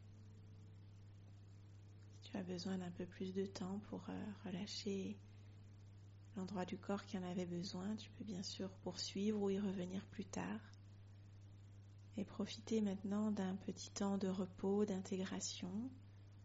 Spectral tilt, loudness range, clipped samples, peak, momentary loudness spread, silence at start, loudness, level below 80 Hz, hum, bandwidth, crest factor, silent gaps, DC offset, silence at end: -6 dB/octave; 6 LU; under 0.1%; -28 dBFS; 20 LU; 0 s; -45 LUFS; -74 dBFS; none; 7.6 kHz; 18 dB; none; under 0.1%; 0 s